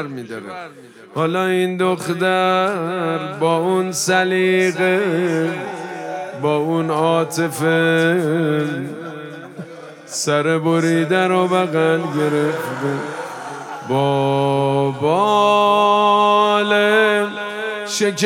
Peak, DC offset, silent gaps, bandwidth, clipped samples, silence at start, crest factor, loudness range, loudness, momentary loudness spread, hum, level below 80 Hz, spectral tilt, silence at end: -2 dBFS; under 0.1%; none; 17 kHz; under 0.1%; 0 s; 16 dB; 5 LU; -17 LUFS; 16 LU; none; -72 dBFS; -5 dB/octave; 0 s